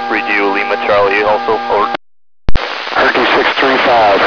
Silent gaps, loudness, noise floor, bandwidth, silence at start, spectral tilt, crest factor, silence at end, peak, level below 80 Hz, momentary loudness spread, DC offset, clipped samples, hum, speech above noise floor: none; -12 LUFS; under -90 dBFS; 5.4 kHz; 0 s; -5 dB/octave; 12 dB; 0 s; 0 dBFS; -28 dBFS; 10 LU; 0.7%; 2%; none; over 78 dB